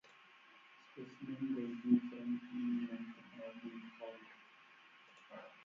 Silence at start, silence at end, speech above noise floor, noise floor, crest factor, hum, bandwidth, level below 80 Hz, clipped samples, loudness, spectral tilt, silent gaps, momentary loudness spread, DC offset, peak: 0.05 s; 0 s; 23 dB; -64 dBFS; 24 dB; none; 6.2 kHz; -88 dBFS; under 0.1%; -42 LUFS; -6 dB/octave; none; 26 LU; under 0.1%; -20 dBFS